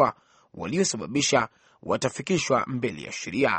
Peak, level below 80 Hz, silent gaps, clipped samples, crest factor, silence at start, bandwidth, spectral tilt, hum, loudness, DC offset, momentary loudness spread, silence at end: -6 dBFS; -60 dBFS; none; under 0.1%; 20 dB; 0 s; 8.8 kHz; -4 dB/octave; none; -26 LUFS; under 0.1%; 11 LU; 0 s